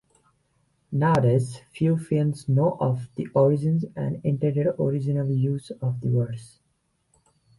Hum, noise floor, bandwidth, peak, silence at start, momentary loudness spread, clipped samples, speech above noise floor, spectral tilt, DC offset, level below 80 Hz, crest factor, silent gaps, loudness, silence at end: none; -71 dBFS; 11.5 kHz; -10 dBFS; 0.9 s; 9 LU; under 0.1%; 48 dB; -9 dB/octave; under 0.1%; -58 dBFS; 16 dB; none; -24 LUFS; 1.1 s